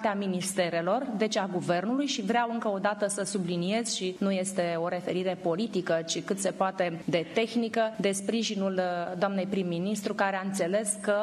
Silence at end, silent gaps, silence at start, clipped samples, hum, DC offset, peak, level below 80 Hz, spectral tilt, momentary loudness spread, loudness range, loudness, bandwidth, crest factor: 0 s; none; 0 s; under 0.1%; none; under 0.1%; -12 dBFS; -76 dBFS; -4.5 dB/octave; 3 LU; 1 LU; -29 LUFS; 13.5 kHz; 16 dB